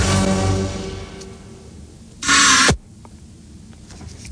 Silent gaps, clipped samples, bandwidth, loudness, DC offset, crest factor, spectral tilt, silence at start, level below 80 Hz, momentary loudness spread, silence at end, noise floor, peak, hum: none; under 0.1%; 10.5 kHz; -15 LUFS; under 0.1%; 18 dB; -2.5 dB/octave; 0 s; -36 dBFS; 26 LU; 0 s; -41 dBFS; -2 dBFS; none